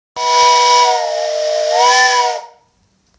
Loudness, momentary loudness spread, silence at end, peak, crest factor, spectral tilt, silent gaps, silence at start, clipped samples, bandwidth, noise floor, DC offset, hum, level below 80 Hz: -12 LUFS; 9 LU; 0.7 s; 0 dBFS; 12 dB; 2.5 dB/octave; none; 0.15 s; under 0.1%; 8 kHz; -58 dBFS; under 0.1%; none; -62 dBFS